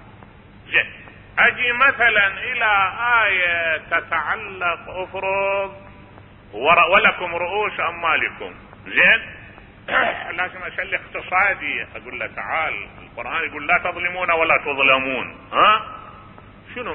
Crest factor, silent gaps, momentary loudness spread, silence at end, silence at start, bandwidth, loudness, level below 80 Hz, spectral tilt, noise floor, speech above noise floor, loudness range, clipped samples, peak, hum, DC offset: 20 dB; none; 15 LU; 0 s; 0 s; 4.8 kHz; -18 LUFS; -50 dBFS; -8 dB/octave; -44 dBFS; 24 dB; 6 LU; under 0.1%; -2 dBFS; none; under 0.1%